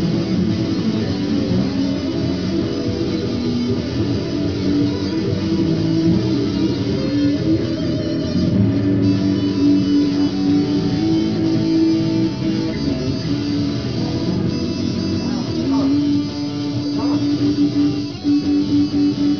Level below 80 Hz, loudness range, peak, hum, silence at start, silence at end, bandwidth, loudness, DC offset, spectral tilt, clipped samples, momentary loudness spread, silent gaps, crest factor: -40 dBFS; 3 LU; -4 dBFS; none; 0 s; 0 s; 5.4 kHz; -19 LUFS; 0.4%; -7.5 dB/octave; under 0.1%; 4 LU; none; 14 dB